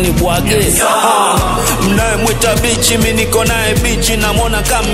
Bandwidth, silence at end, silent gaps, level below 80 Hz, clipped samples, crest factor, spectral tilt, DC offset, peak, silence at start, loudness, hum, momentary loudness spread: 16.5 kHz; 0 s; none; -20 dBFS; under 0.1%; 12 dB; -3.5 dB/octave; under 0.1%; 0 dBFS; 0 s; -11 LUFS; none; 3 LU